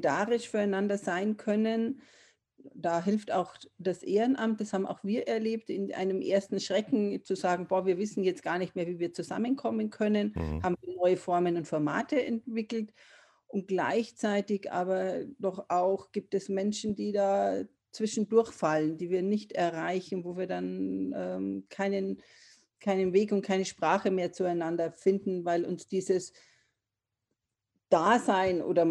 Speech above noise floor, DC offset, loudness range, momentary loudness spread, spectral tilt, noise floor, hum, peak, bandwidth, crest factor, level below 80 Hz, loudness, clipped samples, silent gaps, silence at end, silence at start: 58 dB; under 0.1%; 3 LU; 8 LU; -6 dB/octave; -88 dBFS; none; -10 dBFS; 11 kHz; 20 dB; -60 dBFS; -31 LUFS; under 0.1%; none; 0 s; 0 s